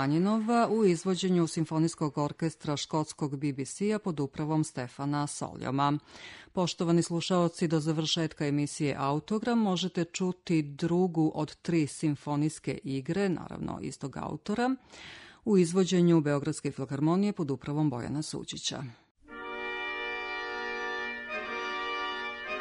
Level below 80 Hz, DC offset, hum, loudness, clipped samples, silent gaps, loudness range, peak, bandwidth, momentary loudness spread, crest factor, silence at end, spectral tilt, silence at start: -64 dBFS; under 0.1%; none; -31 LUFS; under 0.1%; 19.11-19.15 s; 6 LU; -14 dBFS; 11 kHz; 10 LU; 16 dB; 0 s; -5.5 dB/octave; 0 s